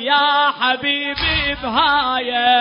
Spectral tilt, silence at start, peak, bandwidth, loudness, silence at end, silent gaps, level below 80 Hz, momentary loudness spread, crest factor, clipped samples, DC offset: -8 dB/octave; 0 s; -2 dBFS; 5.6 kHz; -16 LUFS; 0 s; none; -38 dBFS; 4 LU; 14 dB; under 0.1%; under 0.1%